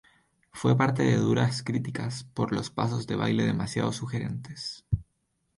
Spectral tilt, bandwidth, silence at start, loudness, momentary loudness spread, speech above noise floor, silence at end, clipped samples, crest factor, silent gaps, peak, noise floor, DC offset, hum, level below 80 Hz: -6.5 dB/octave; 11.5 kHz; 0.55 s; -28 LUFS; 11 LU; 48 dB; 0.55 s; under 0.1%; 18 dB; none; -10 dBFS; -75 dBFS; under 0.1%; none; -50 dBFS